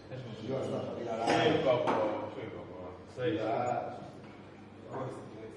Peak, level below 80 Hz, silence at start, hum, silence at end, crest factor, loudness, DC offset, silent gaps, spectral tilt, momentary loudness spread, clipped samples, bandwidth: -16 dBFS; -70 dBFS; 0 s; none; 0 s; 20 dB; -33 LUFS; under 0.1%; none; -6 dB/octave; 20 LU; under 0.1%; 11 kHz